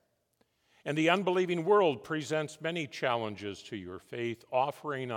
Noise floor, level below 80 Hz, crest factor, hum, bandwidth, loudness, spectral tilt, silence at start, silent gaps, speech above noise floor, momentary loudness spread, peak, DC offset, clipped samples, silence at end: -75 dBFS; -80 dBFS; 22 dB; none; 16 kHz; -31 LUFS; -5.5 dB/octave; 0.85 s; none; 43 dB; 15 LU; -10 dBFS; under 0.1%; under 0.1%; 0 s